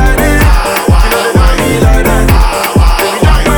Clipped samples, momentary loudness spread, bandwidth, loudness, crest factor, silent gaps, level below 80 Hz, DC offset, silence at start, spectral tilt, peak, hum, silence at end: 1%; 1 LU; over 20 kHz; -9 LUFS; 6 dB; none; -10 dBFS; under 0.1%; 0 s; -5 dB/octave; 0 dBFS; none; 0 s